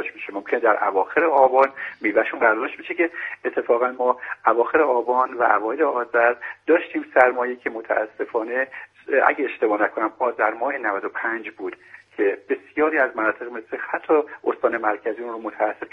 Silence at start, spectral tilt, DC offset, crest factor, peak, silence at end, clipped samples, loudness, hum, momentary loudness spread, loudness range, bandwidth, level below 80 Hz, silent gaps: 0 s; -6.5 dB/octave; under 0.1%; 22 dB; 0 dBFS; 0.05 s; under 0.1%; -22 LUFS; none; 10 LU; 4 LU; 5 kHz; -68 dBFS; none